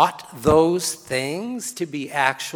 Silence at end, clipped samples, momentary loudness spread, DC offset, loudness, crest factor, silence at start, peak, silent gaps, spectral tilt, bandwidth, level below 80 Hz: 0 s; under 0.1%; 11 LU; under 0.1%; -22 LUFS; 20 dB; 0 s; -2 dBFS; none; -4 dB/octave; 20 kHz; -46 dBFS